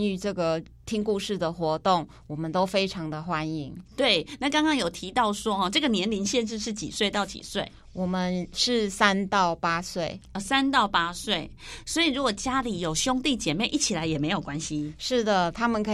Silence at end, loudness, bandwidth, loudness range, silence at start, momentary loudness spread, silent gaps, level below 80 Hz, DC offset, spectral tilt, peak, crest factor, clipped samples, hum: 0 s; -26 LUFS; 14.5 kHz; 2 LU; 0 s; 9 LU; none; -50 dBFS; under 0.1%; -3.5 dB/octave; -6 dBFS; 22 dB; under 0.1%; none